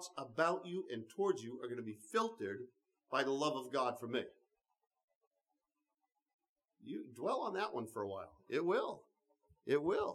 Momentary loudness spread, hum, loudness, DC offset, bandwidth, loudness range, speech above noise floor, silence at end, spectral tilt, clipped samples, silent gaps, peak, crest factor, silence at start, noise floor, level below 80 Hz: 13 LU; none; -40 LUFS; under 0.1%; 14 kHz; 8 LU; 50 dB; 0 s; -4.5 dB/octave; under 0.1%; 5.04-5.08 s, 5.15-5.21 s, 5.27-5.31 s, 6.34-6.39 s, 6.49-6.56 s; -20 dBFS; 22 dB; 0 s; -90 dBFS; -82 dBFS